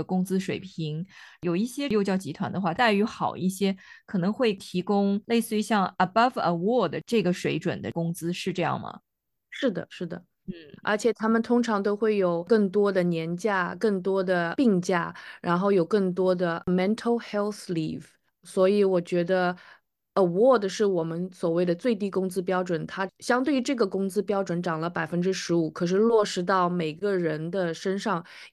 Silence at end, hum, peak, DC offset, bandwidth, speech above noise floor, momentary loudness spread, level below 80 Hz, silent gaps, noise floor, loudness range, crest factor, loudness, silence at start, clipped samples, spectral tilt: 0.05 s; none; -8 dBFS; under 0.1%; 12.5 kHz; 25 dB; 10 LU; -66 dBFS; none; -50 dBFS; 3 LU; 16 dB; -26 LUFS; 0 s; under 0.1%; -6 dB/octave